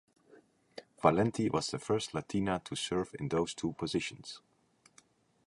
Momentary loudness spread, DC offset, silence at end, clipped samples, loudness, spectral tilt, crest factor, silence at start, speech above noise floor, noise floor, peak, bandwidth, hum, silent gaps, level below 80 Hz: 19 LU; under 0.1%; 1.1 s; under 0.1%; -33 LUFS; -5 dB/octave; 24 dB; 0.75 s; 35 dB; -68 dBFS; -10 dBFS; 11.5 kHz; none; none; -62 dBFS